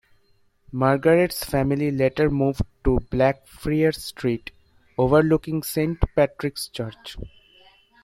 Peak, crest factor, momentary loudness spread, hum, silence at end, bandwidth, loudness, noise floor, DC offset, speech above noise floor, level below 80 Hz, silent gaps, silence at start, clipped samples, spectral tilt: -2 dBFS; 20 dB; 15 LU; none; 0.75 s; 16.5 kHz; -22 LUFS; -61 dBFS; under 0.1%; 40 dB; -38 dBFS; none; 0.7 s; under 0.1%; -6.5 dB/octave